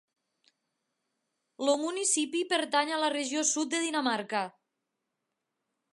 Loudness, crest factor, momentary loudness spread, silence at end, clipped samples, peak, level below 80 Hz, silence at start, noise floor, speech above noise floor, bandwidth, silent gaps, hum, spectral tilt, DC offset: -29 LUFS; 22 dB; 6 LU; 1.45 s; under 0.1%; -12 dBFS; -90 dBFS; 1.6 s; -84 dBFS; 55 dB; 11.5 kHz; none; none; -1 dB/octave; under 0.1%